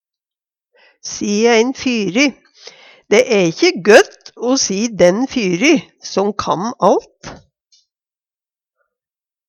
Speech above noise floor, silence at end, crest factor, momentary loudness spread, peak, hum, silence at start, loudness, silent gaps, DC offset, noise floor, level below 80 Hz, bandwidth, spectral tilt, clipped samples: over 76 dB; 2.15 s; 16 dB; 13 LU; 0 dBFS; none; 1.05 s; -14 LUFS; none; under 0.1%; under -90 dBFS; -54 dBFS; 15 kHz; -4 dB/octave; under 0.1%